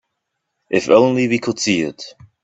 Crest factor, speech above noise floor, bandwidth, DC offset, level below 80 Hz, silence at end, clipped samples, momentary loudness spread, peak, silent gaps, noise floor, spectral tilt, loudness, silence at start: 18 dB; 59 dB; 8.4 kHz; under 0.1%; -58 dBFS; 0.35 s; under 0.1%; 17 LU; 0 dBFS; none; -76 dBFS; -4.5 dB/octave; -16 LUFS; 0.7 s